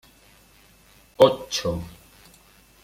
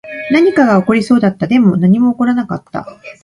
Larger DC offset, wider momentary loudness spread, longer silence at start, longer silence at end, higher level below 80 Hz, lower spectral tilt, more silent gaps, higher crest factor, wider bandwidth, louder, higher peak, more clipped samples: neither; first, 16 LU vs 13 LU; first, 1.2 s vs 0.05 s; first, 0.95 s vs 0.1 s; about the same, -52 dBFS vs -52 dBFS; second, -4.5 dB/octave vs -8 dB/octave; neither; first, 24 dB vs 12 dB; first, 16 kHz vs 11 kHz; second, -22 LUFS vs -12 LUFS; about the same, -2 dBFS vs 0 dBFS; neither